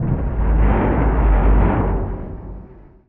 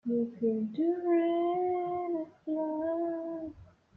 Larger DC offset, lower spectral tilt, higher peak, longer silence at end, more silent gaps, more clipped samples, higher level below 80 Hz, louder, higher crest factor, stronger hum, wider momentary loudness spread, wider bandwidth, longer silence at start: neither; about the same, -9 dB/octave vs -9.5 dB/octave; first, -4 dBFS vs -18 dBFS; about the same, 0.35 s vs 0.3 s; neither; neither; first, -18 dBFS vs -70 dBFS; first, -18 LUFS vs -32 LUFS; about the same, 12 dB vs 12 dB; neither; first, 17 LU vs 9 LU; second, 3.3 kHz vs 4.1 kHz; about the same, 0 s vs 0.05 s